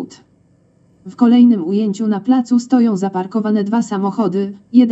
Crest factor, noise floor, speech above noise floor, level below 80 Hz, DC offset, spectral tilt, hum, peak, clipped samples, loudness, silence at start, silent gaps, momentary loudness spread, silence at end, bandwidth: 16 dB; -54 dBFS; 40 dB; -68 dBFS; under 0.1%; -7.5 dB/octave; none; 0 dBFS; under 0.1%; -15 LUFS; 0 s; none; 9 LU; 0 s; 8 kHz